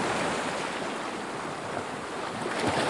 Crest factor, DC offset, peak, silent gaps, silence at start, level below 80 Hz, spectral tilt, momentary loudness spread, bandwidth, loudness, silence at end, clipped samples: 16 dB; under 0.1%; -14 dBFS; none; 0 s; -62 dBFS; -3.5 dB/octave; 6 LU; 11.5 kHz; -32 LUFS; 0 s; under 0.1%